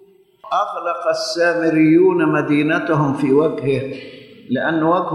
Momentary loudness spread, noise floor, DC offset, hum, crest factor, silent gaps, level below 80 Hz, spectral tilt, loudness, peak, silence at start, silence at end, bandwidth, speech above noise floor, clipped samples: 10 LU; -43 dBFS; under 0.1%; none; 14 dB; none; -56 dBFS; -6.5 dB/octave; -17 LUFS; -4 dBFS; 0.45 s; 0 s; 11.5 kHz; 27 dB; under 0.1%